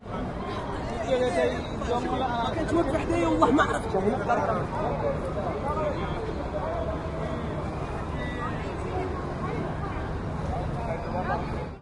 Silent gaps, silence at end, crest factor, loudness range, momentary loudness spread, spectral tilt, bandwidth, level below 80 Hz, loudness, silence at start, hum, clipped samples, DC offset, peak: none; 0 s; 20 dB; 6 LU; 7 LU; -7 dB/octave; 11.5 kHz; -40 dBFS; -28 LUFS; 0 s; none; under 0.1%; under 0.1%; -6 dBFS